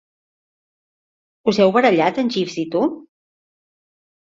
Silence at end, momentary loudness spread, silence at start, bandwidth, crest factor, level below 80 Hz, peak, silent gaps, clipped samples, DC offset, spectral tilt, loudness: 1.3 s; 9 LU; 1.45 s; 7.8 kHz; 18 dB; -64 dBFS; -2 dBFS; none; under 0.1%; under 0.1%; -6 dB/octave; -18 LUFS